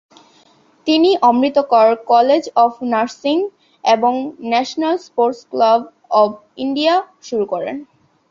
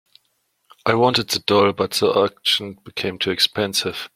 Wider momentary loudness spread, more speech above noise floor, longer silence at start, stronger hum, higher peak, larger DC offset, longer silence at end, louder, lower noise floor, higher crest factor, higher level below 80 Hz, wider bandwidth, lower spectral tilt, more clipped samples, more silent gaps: about the same, 10 LU vs 8 LU; second, 37 dB vs 49 dB; about the same, 0.85 s vs 0.85 s; neither; about the same, -2 dBFS vs -2 dBFS; neither; first, 0.5 s vs 0.1 s; first, -16 LUFS vs -19 LUFS; second, -52 dBFS vs -68 dBFS; second, 14 dB vs 20 dB; second, -66 dBFS vs -60 dBFS; second, 7.6 kHz vs 16.5 kHz; about the same, -4.5 dB/octave vs -3.5 dB/octave; neither; neither